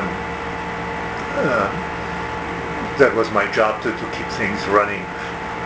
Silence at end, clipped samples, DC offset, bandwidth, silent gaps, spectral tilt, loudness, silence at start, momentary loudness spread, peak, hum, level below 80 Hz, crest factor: 0 s; under 0.1%; under 0.1%; 8 kHz; none; -5.5 dB/octave; -21 LUFS; 0 s; 9 LU; 0 dBFS; none; -42 dBFS; 22 dB